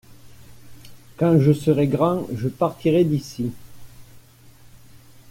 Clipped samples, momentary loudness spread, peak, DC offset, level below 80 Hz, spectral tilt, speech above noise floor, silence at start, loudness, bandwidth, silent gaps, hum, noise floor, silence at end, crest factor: under 0.1%; 12 LU; -6 dBFS; under 0.1%; -54 dBFS; -8 dB/octave; 29 dB; 0.1 s; -21 LUFS; 16.5 kHz; none; none; -48 dBFS; 0.35 s; 18 dB